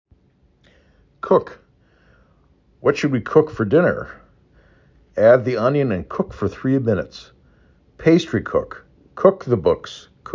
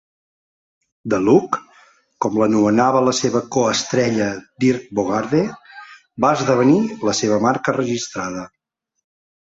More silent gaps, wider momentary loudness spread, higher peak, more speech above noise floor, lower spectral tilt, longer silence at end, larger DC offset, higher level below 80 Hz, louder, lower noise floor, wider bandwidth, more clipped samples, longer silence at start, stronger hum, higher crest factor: neither; first, 20 LU vs 11 LU; about the same, -2 dBFS vs -2 dBFS; first, 40 dB vs 35 dB; first, -7.5 dB/octave vs -5 dB/octave; second, 0 s vs 1.1 s; neither; first, -48 dBFS vs -56 dBFS; about the same, -19 LUFS vs -18 LUFS; first, -58 dBFS vs -52 dBFS; about the same, 7.6 kHz vs 8 kHz; neither; first, 1.25 s vs 1.05 s; neither; about the same, 20 dB vs 18 dB